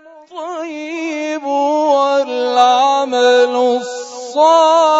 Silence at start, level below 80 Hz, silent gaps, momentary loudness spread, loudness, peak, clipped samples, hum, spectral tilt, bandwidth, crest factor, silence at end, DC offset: 0.3 s; -78 dBFS; none; 15 LU; -14 LUFS; 0 dBFS; under 0.1%; none; -1.5 dB/octave; 8 kHz; 14 dB; 0 s; under 0.1%